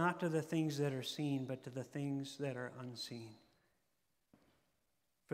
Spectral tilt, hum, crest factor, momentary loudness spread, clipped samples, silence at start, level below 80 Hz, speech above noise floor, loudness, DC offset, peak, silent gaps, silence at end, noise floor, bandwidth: -6 dB/octave; none; 22 dB; 10 LU; under 0.1%; 0 s; -86 dBFS; 44 dB; -41 LUFS; under 0.1%; -22 dBFS; none; 0 s; -85 dBFS; 16 kHz